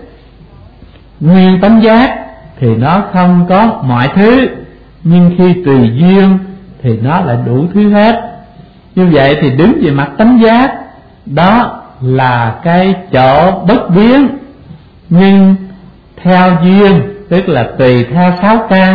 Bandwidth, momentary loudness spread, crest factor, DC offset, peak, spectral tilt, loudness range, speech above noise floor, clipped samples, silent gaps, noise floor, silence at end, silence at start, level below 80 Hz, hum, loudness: 5 kHz; 9 LU; 8 dB; 1%; 0 dBFS; -10 dB/octave; 2 LU; 29 dB; 0.3%; none; -36 dBFS; 0 s; 0 s; -36 dBFS; none; -8 LUFS